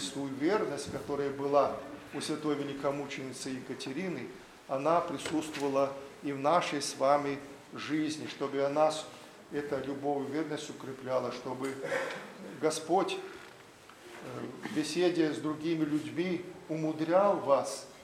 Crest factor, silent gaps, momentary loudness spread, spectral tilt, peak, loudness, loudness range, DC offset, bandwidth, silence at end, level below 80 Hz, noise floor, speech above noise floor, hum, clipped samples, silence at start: 20 dB; none; 14 LU; -5 dB/octave; -12 dBFS; -33 LUFS; 4 LU; under 0.1%; 15 kHz; 0 s; -72 dBFS; -54 dBFS; 22 dB; none; under 0.1%; 0 s